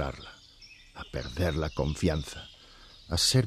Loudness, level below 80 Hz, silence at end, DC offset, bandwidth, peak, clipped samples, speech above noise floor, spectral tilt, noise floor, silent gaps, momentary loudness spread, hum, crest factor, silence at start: -31 LUFS; -42 dBFS; 0 s; under 0.1%; 14 kHz; -12 dBFS; under 0.1%; 24 dB; -4.5 dB/octave; -53 dBFS; none; 23 LU; none; 20 dB; 0 s